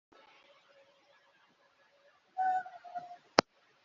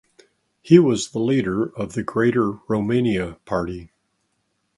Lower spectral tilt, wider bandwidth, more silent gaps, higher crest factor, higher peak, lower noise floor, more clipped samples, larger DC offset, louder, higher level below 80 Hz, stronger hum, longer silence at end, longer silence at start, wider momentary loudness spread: second, -1 dB/octave vs -6.5 dB/octave; second, 7.4 kHz vs 11.5 kHz; neither; first, 38 dB vs 20 dB; about the same, -2 dBFS vs 0 dBFS; about the same, -69 dBFS vs -71 dBFS; neither; neither; second, -35 LUFS vs -21 LUFS; second, -78 dBFS vs -50 dBFS; neither; second, 0.45 s vs 0.9 s; first, 2.35 s vs 0.65 s; first, 16 LU vs 11 LU